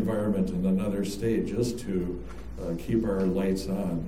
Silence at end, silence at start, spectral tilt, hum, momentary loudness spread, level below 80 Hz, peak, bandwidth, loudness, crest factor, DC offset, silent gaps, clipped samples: 0 s; 0 s; -7 dB/octave; none; 8 LU; -42 dBFS; -14 dBFS; 15 kHz; -29 LUFS; 14 dB; 0.7%; none; under 0.1%